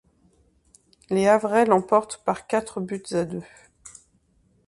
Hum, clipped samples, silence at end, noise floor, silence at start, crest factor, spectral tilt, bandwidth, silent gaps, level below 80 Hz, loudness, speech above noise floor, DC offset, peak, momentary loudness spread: none; under 0.1%; 0.8 s; -64 dBFS; 1.1 s; 22 dB; -5.5 dB/octave; 11.5 kHz; none; -62 dBFS; -23 LUFS; 41 dB; under 0.1%; -4 dBFS; 13 LU